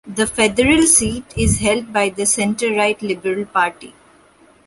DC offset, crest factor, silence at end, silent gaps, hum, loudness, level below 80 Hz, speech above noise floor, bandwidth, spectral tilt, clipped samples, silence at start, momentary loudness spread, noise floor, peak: under 0.1%; 18 dB; 0.75 s; none; none; -16 LUFS; -36 dBFS; 33 dB; 12 kHz; -3.5 dB/octave; under 0.1%; 0.05 s; 9 LU; -50 dBFS; 0 dBFS